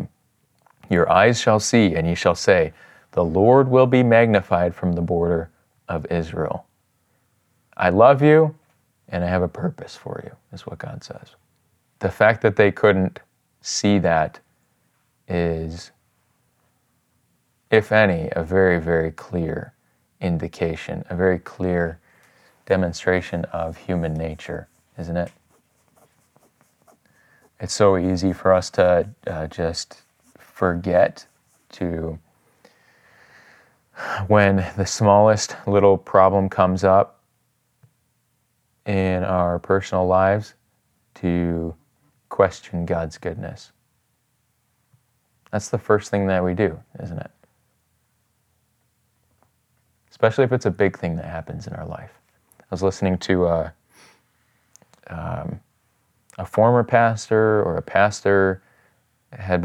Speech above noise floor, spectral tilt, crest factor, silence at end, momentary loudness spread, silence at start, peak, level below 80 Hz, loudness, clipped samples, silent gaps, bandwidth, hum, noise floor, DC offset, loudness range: 49 dB; -6 dB/octave; 20 dB; 0 s; 18 LU; 0 s; 0 dBFS; -52 dBFS; -20 LUFS; under 0.1%; none; 12.5 kHz; none; -68 dBFS; under 0.1%; 10 LU